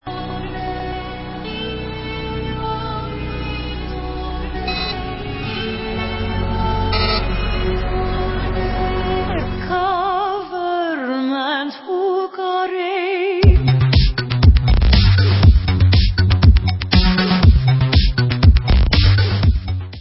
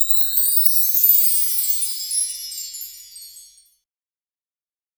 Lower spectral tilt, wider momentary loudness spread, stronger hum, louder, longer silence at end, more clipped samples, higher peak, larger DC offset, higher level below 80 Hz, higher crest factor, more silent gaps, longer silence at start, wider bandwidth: first, -10.5 dB/octave vs 6 dB/octave; second, 13 LU vs 18 LU; neither; second, -18 LUFS vs -15 LUFS; second, 0 s vs 1.55 s; neither; about the same, 0 dBFS vs 0 dBFS; neither; first, -20 dBFS vs -70 dBFS; about the same, 16 dB vs 20 dB; neither; about the same, 0.05 s vs 0 s; second, 5.8 kHz vs over 20 kHz